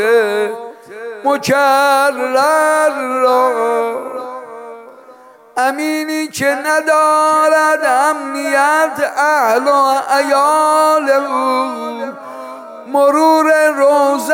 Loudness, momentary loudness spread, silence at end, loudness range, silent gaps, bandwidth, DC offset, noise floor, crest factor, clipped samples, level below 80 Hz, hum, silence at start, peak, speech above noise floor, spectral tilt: -13 LUFS; 16 LU; 0 s; 5 LU; none; 17 kHz; under 0.1%; -41 dBFS; 12 dB; under 0.1%; -70 dBFS; none; 0 s; -2 dBFS; 28 dB; -3 dB/octave